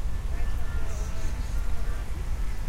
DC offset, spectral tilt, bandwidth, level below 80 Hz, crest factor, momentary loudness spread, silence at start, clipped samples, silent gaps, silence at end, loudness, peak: under 0.1%; -5.5 dB/octave; 13 kHz; -28 dBFS; 10 dB; 1 LU; 0 s; under 0.1%; none; 0 s; -34 LUFS; -14 dBFS